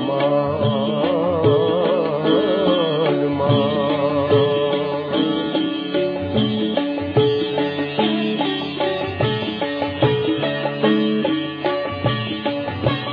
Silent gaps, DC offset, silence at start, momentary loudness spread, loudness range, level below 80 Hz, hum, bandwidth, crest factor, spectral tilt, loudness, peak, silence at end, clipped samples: none; under 0.1%; 0 s; 5 LU; 3 LU; -54 dBFS; none; 5.2 kHz; 16 dB; -9 dB/octave; -20 LUFS; -2 dBFS; 0 s; under 0.1%